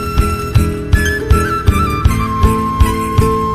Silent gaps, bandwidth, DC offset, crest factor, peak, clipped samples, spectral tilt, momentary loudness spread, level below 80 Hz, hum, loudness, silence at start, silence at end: none; 15 kHz; under 0.1%; 12 dB; 0 dBFS; 0.7%; -6 dB/octave; 2 LU; -18 dBFS; none; -14 LUFS; 0 s; 0 s